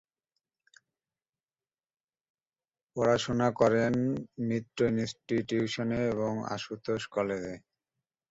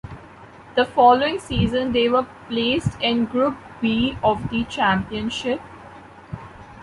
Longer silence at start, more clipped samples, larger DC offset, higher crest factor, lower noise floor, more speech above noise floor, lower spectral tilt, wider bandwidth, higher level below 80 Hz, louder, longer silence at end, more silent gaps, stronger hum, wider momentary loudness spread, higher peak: first, 2.95 s vs 0.05 s; neither; neither; about the same, 20 dB vs 18 dB; first, under -90 dBFS vs -43 dBFS; first, over 60 dB vs 23 dB; about the same, -6 dB/octave vs -6 dB/octave; second, 8 kHz vs 11.5 kHz; second, -62 dBFS vs -42 dBFS; second, -30 LUFS vs -21 LUFS; first, 0.7 s vs 0 s; neither; neither; second, 11 LU vs 22 LU; second, -12 dBFS vs -2 dBFS